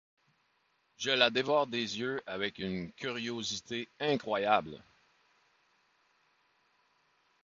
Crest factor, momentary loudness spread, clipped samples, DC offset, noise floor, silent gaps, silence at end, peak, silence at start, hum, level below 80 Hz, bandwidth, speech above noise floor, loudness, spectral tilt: 26 dB; 11 LU; under 0.1%; under 0.1%; -74 dBFS; none; 2.65 s; -10 dBFS; 1 s; none; -70 dBFS; 7.4 kHz; 42 dB; -32 LUFS; -1.5 dB/octave